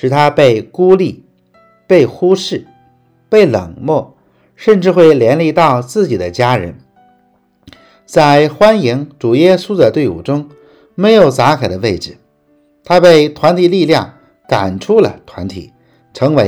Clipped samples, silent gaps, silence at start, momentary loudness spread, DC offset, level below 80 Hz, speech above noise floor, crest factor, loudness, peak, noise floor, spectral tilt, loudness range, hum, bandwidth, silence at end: 1%; none; 0.05 s; 12 LU; under 0.1%; -48 dBFS; 44 dB; 12 dB; -11 LUFS; 0 dBFS; -54 dBFS; -6.5 dB/octave; 3 LU; none; 14 kHz; 0 s